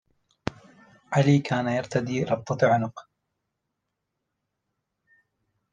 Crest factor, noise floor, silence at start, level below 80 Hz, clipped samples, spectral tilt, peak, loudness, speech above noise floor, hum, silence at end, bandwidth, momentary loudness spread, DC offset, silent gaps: 22 dB; -81 dBFS; 0.45 s; -62 dBFS; under 0.1%; -7 dB/octave; -6 dBFS; -25 LUFS; 58 dB; none; 2.7 s; 9.2 kHz; 15 LU; under 0.1%; none